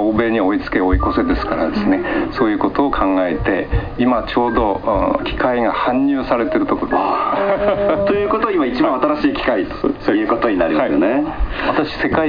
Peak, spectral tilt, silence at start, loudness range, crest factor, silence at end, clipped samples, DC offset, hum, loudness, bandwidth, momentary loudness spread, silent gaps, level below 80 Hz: -2 dBFS; -8.5 dB/octave; 0 s; 1 LU; 14 dB; 0 s; under 0.1%; 0.3%; none; -17 LUFS; 5.2 kHz; 3 LU; none; -30 dBFS